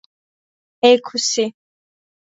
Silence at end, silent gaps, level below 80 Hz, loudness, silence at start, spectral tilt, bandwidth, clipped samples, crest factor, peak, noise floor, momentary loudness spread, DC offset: 0.85 s; none; -72 dBFS; -17 LUFS; 0.85 s; -2 dB/octave; 8 kHz; under 0.1%; 20 dB; 0 dBFS; under -90 dBFS; 8 LU; under 0.1%